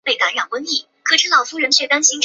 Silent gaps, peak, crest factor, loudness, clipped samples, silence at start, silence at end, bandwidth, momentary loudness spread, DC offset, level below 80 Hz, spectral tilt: none; 0 dBFS; 16 dB; -15 LUFS; under 0.1%; 0.05 s; 0 s; 8.2 kHz; 8 LU; under 0.1%; -74 dBFS; 2.5 dB/octave